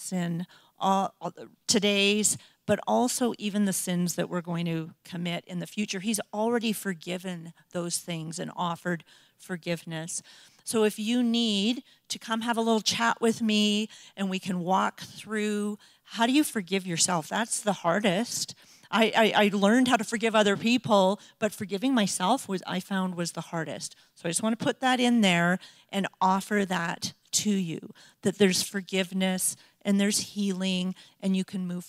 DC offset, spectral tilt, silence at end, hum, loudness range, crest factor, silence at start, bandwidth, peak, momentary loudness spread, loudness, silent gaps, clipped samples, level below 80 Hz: under 0.1%; -4 dB/octave; 0 s; none; 7 LU; 20 dB; 0 s; 16 kHz; -6 dBFS; 13 LU; -27 LUFS; none; under 0.1%; -74 dBFS